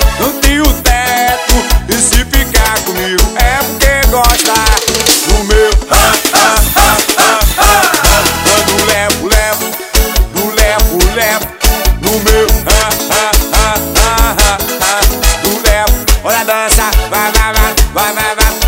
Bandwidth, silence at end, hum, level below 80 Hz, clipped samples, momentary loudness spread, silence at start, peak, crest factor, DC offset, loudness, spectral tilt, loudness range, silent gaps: 16.5 kHz; 0 s; none; -14 dBFS; 0.8%; 4 LU; 0 s; 0 dBFS; 10 dB; under 0.1%; -9 LUFS; -2.5 dB/octave; 3 LU; none